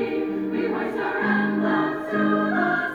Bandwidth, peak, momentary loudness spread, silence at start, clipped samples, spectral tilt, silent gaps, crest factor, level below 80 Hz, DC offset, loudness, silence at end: 7 kHz; -8 dBFS; 4 LU; 0 s; under 0.1%; -8 dB/octave; none; 14 dB; -64 dBFS; under 0.1%; -23 LUFS; 0 s